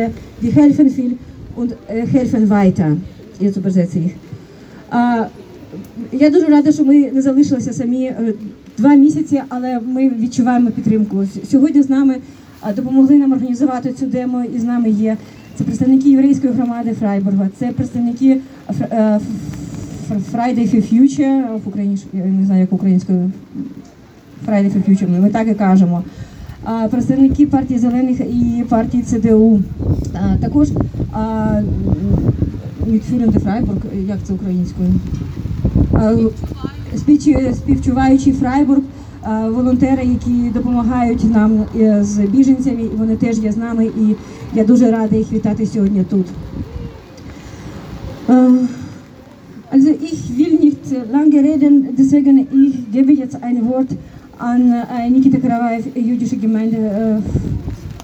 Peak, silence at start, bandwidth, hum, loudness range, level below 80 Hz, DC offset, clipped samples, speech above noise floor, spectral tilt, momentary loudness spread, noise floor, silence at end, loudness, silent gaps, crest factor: 0 dBFS; 0 s; 8.4 kHz; none; 4 LU; -34 dBFS; under 0.1%; under 0.1%; 26 dB; -8.5 dB/octave; 14 LU; -40 dBFS; 0 s; -14 LUFS; none; 14 dB